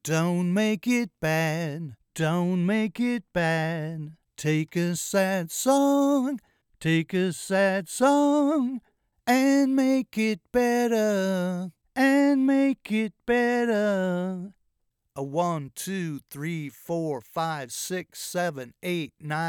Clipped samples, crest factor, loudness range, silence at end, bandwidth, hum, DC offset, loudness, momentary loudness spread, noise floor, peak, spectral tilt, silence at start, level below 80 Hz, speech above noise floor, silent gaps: under 0.1%; 16 dB; 7 LU; 0 s; 18 kHz; none; under 0.1%; -25 LUFS; 12 LU; -75 dBFS; -10 dBFS; -5.5 dB/octave; 0.05 s; -64 dBFS; 50 dB; none